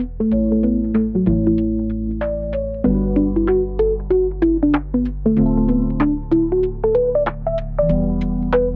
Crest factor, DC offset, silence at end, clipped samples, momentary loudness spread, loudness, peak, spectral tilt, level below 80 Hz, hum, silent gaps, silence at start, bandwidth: 12 dB; under 0.1%; 0 s; under 0.1%; 6 LU; -19 LUFS; -4 dBFS; -11.5 dB/octave; -26 dBFS; none; none; 0 s; 4.5 kHz